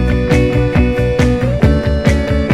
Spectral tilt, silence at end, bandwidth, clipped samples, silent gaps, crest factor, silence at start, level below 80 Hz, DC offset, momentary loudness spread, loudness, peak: -7.5 dB/octave; 0 s; 12.5 kHz; under 0.1%; none; 12 dB; 0 s; -18 dBFS; under 0.1%; 1 LU; -13 LUFS; 0 dBFS